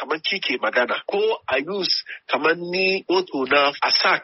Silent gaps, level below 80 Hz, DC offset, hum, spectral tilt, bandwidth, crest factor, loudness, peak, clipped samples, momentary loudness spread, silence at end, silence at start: none; -68 dBFS; under 0.1%; none; 0 dB/octave; 6 kHz; 16 dB; -21 LUFS; -6 dBFS; under 0.1%; 5 LU; 0 s; 0 s